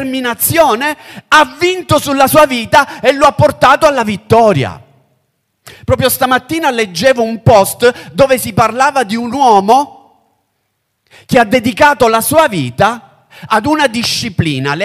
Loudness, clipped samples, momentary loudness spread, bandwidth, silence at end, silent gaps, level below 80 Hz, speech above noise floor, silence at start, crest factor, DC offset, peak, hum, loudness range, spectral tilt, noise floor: -10 LUFS; 0.3%; 7 LU; 16.5 kHz; 0 s; none; -40 dBFS; 55 dB; 0 s; 12 dB; under 0.1%; 0 dBFS; none; 3 LU; -4.5 dB/octave; -66 dBFS